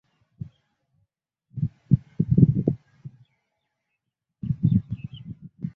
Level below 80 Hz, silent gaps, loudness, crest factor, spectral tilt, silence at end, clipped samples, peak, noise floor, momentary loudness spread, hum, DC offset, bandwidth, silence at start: -46 dBFS; none; -24 LUFS; 26 dB; -12.5 dB/octave; 0.05 s; under 0.1%; -2 dBFS; -81 dBFS; 23 LU; none; under 0.1%; 3.7 kHz; 1.55 s